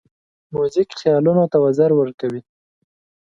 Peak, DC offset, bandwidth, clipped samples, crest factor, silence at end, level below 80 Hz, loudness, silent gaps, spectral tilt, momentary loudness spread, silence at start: -4 dBFS; under 0.1%; 7.6 kHz; under 0.1%; 16 dB; 0.85 s; -60 dBFS; -18 LUFS; 2.14-2.18 s; -8 dB/octave; 11 LU; 0.5 s